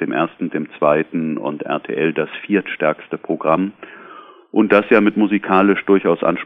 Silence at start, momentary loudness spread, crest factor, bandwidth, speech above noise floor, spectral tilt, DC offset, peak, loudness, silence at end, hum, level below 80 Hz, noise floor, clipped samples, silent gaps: 0 s; 10 LU; 18 dB; 4.6 kHz; 23 dB; -9 dB/octave; under 0.1%; 0 dBFS; -18 LUFS; 0 s; none; -58 dBFS; -41 dBFS; under 0.1%; none